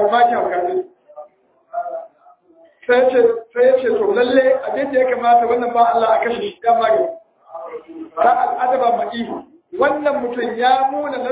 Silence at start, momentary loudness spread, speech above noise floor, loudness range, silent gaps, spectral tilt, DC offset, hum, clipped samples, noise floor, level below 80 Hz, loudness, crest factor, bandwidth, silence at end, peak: 0 s; 17 LU; 35 dB; 4 LU; none; -8 dB/octave; under 0.1%; none; under 0.1%; -51 dBFS; -60 dBFS; -17 LUFS; 16 dB; 4 kHz; 0 s; -2 dBFS